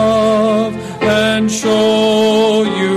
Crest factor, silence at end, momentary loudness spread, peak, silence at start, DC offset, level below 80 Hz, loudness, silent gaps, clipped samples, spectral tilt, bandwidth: 8 dB; 0 s; 4 LU; -4 dBFS; 0 s; under 0.1%; -48 dBFS; -13 LUFS; none; under 0.1%; -4.5 dB/octave; 14 kHz